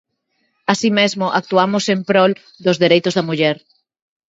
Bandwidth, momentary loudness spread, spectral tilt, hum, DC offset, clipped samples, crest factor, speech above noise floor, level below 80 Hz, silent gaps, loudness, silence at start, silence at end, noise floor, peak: 8 kHz; 6 LU; -5 dB/octave; none; under 0.1%; under 0.1%; 18 dB; 52 dB; -64 dBFS; none; -16 LUFS; 0.7 s; 0.75 s; -68 dBFS; 0 dBFS